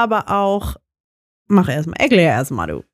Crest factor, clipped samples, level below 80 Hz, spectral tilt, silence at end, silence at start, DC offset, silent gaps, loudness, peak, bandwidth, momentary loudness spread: 16 dB; under 0.1%; -38 dBFS; -6.5 dB/octave; 0.15 s; 0 s; under 0.1%; 1.00-1.45 s; -17 LUFS; -2 dBFS; 15.5 kHz; 10 LU